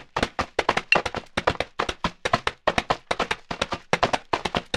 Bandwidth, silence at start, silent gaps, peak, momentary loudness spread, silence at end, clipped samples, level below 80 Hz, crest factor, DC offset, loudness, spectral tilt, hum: 15 kHz; 0 s; none; 0 dBFS; 7 LU; 0 s; under 0.1%; -44 dBFS; 26 dB; under 0.1%; -25 LUFS; -3.5 dB/octave; none